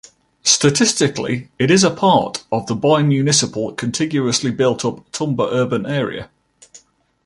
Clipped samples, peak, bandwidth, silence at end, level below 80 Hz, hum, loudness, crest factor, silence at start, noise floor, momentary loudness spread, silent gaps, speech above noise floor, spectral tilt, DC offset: under 0.1%; 0 dBFS; 11.5 kHz; 0.5 s; -54 dBFS; none; -17 LUFS; 18 dB; 0.45 s; -49 dBFS; 10 LU; none; 33 dB; -4 dB/octave; under 0.1%